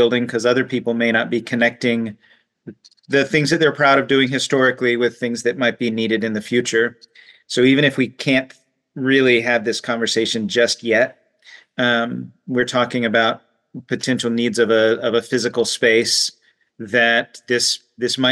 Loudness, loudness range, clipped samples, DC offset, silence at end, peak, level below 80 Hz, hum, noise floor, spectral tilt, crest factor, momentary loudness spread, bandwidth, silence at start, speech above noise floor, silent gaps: -18 LUFS; 2 LU; under 0.1%; under 0.1%; 0 s; -4 dBFS; -66 dBFS; none; -47 dBFS; -4 dB/octave; 14 dB; 8 LU; 12.5 kHz; 0 s; 29 dB; none